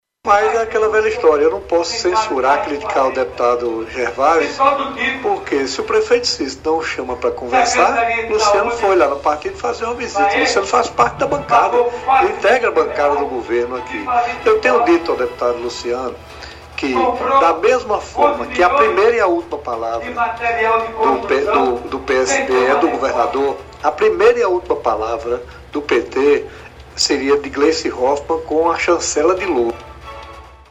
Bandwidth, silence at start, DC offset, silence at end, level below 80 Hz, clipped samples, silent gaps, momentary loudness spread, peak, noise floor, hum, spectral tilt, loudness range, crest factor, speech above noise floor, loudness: 10.5 kHz; 0.25 s; under 0.1%; 0.15 s; -44 dBFS; under 0.1%; none; 9 LU; 0 dBFS; -37 dBFS; none; -3.5 dB/octave; 2 LU; 16 dB; 21 dB; -16 LUFS